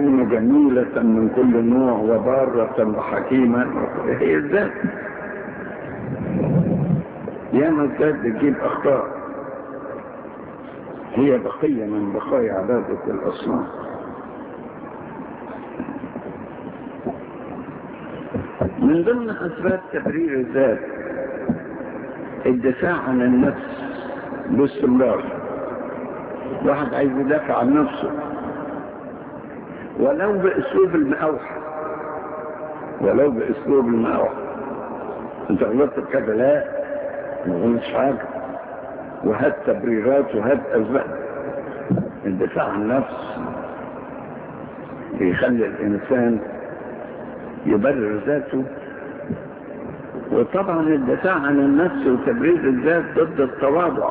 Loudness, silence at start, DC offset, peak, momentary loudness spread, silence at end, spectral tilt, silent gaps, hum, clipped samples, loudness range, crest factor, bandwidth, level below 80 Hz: -21 LUFS; 0 s; under 0.1%; -4 dBFS; 16 LU; 0 s; -11.5 dB/octave; none; none; under 0.1%; 6 LU; 16 dB; 4 kHz; -50 dBFS